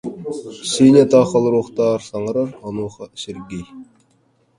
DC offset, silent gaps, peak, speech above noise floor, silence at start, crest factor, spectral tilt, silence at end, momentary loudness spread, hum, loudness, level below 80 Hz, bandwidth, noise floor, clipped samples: under 0.1%; none; 0 dBFS; 43 dB; 0.05 s; 18 dB; -6 dB/octave; 0.75 s; 19 LU; none; -16 LUFS; -54 dBFS; 11.5 kHz; -60 dBFS; under 0.1%